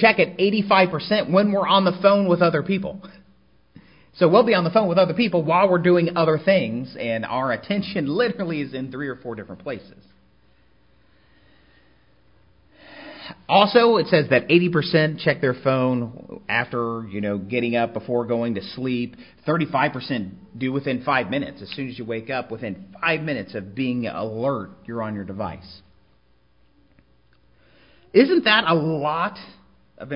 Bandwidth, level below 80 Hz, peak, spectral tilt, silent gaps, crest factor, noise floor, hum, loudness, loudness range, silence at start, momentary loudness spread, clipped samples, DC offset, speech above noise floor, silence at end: 5.4 kHz; -58 dBFS; 0 dBFS; -10.5 dB/octave; none; 22 dB; -61 dBFS; none; -21 LUFS; 11 LU; 0 s; 15 LU; under 0.1%; 0.1%; 40 dB; 0 s